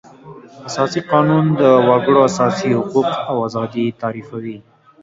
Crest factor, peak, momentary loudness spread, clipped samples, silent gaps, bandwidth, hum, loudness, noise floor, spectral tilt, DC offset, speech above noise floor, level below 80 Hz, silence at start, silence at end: 16 dB; 0 dBFS; 16 LU; under 0.1%; none; 7.8 kHz; none; -16 LUFS; -39 dBFS; -6.5 dB/octave; under 0.1%; 23 dB; -56 dBFS; 0.25 s; 0.45 s